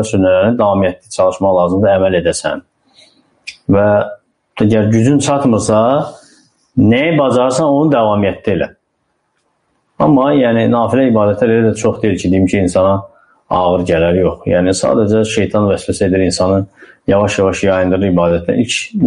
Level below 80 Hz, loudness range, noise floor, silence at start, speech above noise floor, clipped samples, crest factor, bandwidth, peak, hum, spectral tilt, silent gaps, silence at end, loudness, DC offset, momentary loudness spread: -42 dBFS; 2 LU; -65 dBFS; 0 s; 53 dB; under 0.1%; 12 dB; 10.5 kHz; -2 dBFS; none; -6 dB/octave; none; 0 s; -13 LUFS; under 0.1%; 6 LU